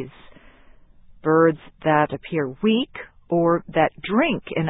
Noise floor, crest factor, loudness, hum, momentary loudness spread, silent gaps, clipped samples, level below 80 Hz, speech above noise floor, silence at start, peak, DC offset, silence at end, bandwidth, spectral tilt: -49 dBFS; 18 dB; -21 LUFS; none; 10 LU; none; under 0.1%; -54 dBFS; 28 dB; 0 s; -4 dBFS; under 0.1%; 0 s; 4 kHz; -11 dB/octave